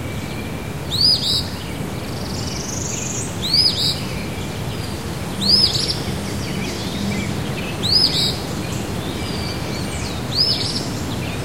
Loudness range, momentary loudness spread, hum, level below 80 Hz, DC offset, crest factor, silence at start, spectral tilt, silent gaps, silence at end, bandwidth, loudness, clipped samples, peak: 3 LU; 13 LU; none; -36 dBFS; 1%; 18 dB; 0 s; -3.5 dB/octave; none; 0 s; 16 kHz; -19 LUFS; under 0.1%; -2 dBFS